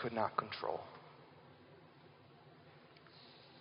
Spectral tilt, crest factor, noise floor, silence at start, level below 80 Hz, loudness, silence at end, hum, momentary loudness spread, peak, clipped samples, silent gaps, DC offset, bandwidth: -3.5 dB/octave; 30 dB; -62 dBFS; 0 s; -84 dBFS; -41 LUFS; 0 s; none; 23 LU; -16 dBFS; under 0.1%; none; under 0.1%; 5.2 kHz